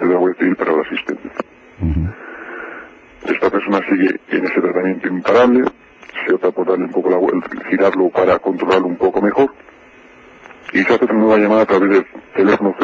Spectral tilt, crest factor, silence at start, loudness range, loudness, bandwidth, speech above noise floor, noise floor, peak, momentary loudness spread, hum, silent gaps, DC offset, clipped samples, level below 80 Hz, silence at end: -7.5 dB/octave; 16 dB; 0 s; 5 LU; -16 LUFS; 7.6 kHz; 30 dB; -43 dBFS; 0 dBFS; 16 LU; none; none; under 0.1%; under 0.1%; -38 dBFS; 0 s